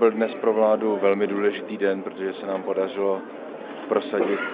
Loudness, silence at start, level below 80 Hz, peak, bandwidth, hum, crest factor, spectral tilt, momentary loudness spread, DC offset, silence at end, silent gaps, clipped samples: -24 LUFS; 0 s; -80 dBFS; -6 dBFS; 4.8 kHz; none; 18 dB; -10 dB/octave; 10 LU; under 0.1%; 0 s; none; under 0.1%